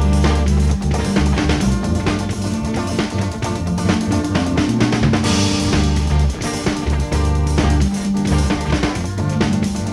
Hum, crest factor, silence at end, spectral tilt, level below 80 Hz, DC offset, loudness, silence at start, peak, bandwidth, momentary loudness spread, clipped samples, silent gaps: none; 14 dB; 0 s; -5.5 dB/octave; -22 dBFS; under 0.1%; -18 LUFS; 0 s; -2 dBFS; 12.5 kHz; 5 LU; under 0.1%; none